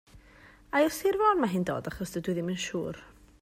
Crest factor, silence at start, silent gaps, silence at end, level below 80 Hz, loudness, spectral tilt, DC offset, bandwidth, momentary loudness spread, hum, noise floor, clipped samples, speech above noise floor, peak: 18 dB; 0.15 s; none; 0.3 s; -56 dBFS; -29 LUFS; -5.5 dB/octave; under 0.1%; 16 kHz; 11 LU; none; -55 dBFS; under 0.1%; 27 dB; -12 dBFS